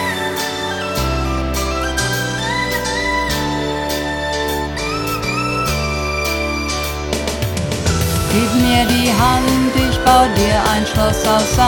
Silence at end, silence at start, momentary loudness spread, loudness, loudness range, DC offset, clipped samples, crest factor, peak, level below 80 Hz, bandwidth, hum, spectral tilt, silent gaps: 0 s; 0 s; 7 LU; -17 LUFS; 5 LU; under 0.1%; under 0.1%; 16 dB; 0 dBFS; -26 dBFS; 19 kHz; none; -4 dB/octave; none